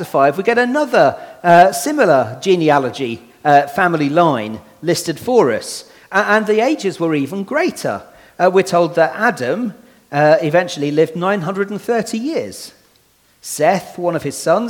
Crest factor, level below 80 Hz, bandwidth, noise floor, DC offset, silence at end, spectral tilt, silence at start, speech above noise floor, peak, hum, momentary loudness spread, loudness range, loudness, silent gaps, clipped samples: 16 dB; -60 dBFS; 18.5 kHz; -55 dBFS; under 0.1%; 0 s; -5 dB/octave; 0 s; 40 dB; 0 dBFS; none; 11 LU; 6 LU; -15 LUFS; none; under 0.1%